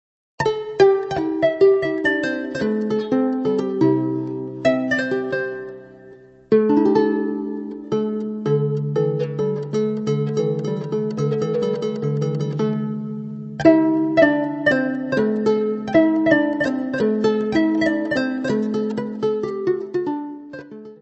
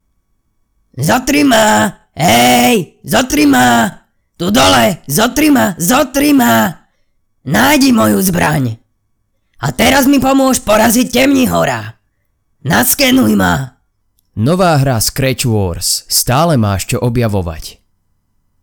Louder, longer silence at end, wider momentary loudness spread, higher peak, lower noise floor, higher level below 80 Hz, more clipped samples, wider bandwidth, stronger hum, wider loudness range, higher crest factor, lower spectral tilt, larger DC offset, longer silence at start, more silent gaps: second, -20 LUFS vs -11 LUFS; second, 0.05 s vs 0.9 s; about the same, 10 LU vs 10 LU; about the same, 0 dBFS vs 0 dBFS; second, -45 dBFS vs -63 dBFS; second, -56 dBFS vs -36 dBFS; neither; second, 8.2 kHz vs over 20 kHz; neither; about the same, 4 LU vs 3 LU; first, 20 dB vs 12 dB; first, -7.5 dB/octave vs -4 dB/octave; neither; second, 0.4 s vs 0.95 s; neither